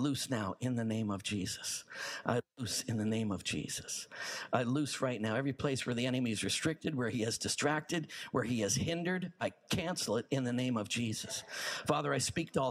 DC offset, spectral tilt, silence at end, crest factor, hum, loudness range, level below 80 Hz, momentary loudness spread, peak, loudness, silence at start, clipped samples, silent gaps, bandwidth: under 0.1%; -4 dB/octave; 0 s; 22 dB; none; 2 LU; -66 dBFS; 6 LU; -14 dBFS; -35 LUFS; 0 s; under 0.1%; none; 15.5 kHz